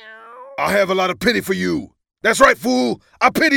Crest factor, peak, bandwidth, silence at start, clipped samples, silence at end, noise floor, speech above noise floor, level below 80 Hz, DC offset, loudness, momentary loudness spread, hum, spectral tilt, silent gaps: 18 dB; 0 dBFS; 19 kHz; 0.05 s; under 0.1%; 0 s; -39 dBFS; 22 dB; -48 dBFS; under 0.1%; -17 LUFS; 10 LU; none; -4 dB/octave; none